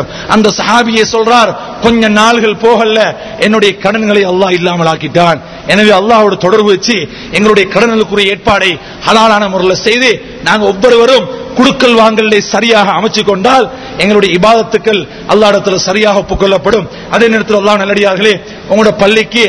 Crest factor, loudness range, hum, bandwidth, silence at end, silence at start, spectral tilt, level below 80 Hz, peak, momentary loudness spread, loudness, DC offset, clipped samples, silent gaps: 8 dB; 1 LU; none; 11 kHz; 0 s; 0 s; -4 dB/octave; -36 dBFS; 0 dBFS; 6 LU; -8 LUFS; 0.1%; 4%; none